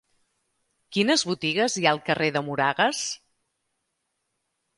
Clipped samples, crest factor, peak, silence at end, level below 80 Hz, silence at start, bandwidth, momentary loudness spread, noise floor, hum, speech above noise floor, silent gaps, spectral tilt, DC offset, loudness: under 0.1%; 22 dB; -4 dBFS; 1.6 s; -70 dBFS; 0.9 s; 11.5 kHz; 8 LU; -78 dBFS; none; 54 dB; none; -3 dB/octave; under 0.1%; -24 LUFS